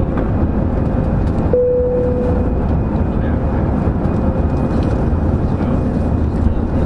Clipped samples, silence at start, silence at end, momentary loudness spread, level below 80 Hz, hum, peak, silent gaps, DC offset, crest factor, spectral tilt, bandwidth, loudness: under 0.1%; 0 s; 0 s; 2 LU; -22 dBFS; none; 0 dBFS; none; under 0.1%; 14 dB; -10.5 dB/octave; 5.8 kHz; -17 LUFS